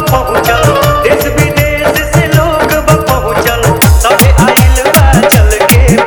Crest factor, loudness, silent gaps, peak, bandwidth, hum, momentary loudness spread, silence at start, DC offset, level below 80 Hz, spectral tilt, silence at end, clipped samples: 6 dB; -7 LUFS; none; 0 dBFS; over 20 kHz; none; 4 LU; 0 s; under 0.1%; -14 dBFS; -5 dB/octave; 0 s; 2%